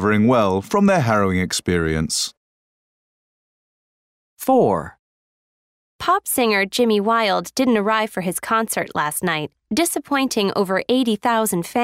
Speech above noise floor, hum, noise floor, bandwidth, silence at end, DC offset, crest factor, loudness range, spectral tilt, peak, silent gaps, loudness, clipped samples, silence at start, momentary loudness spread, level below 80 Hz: over 71 dB; none; under -90 dBFS; 16 kHz; 0 s; under 0.1%; 16 dB; 6 LU; -4.5 dB/octave; -4 dBFS; 2.37-4.36 s, 4.99-5.99 s; -19 LUFS; under 0.1%; 0 s; 7 LU; -48 dBFS